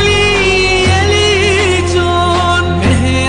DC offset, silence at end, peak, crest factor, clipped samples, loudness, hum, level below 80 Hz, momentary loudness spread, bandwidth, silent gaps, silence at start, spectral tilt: 0.9%; 0 s; -2 dBFS; 8 dB; under 0.1%; -10 LUFS; none; -24 dBFS; 3 LU; 10 kHz; none; 0 s; -4.5 dB/octave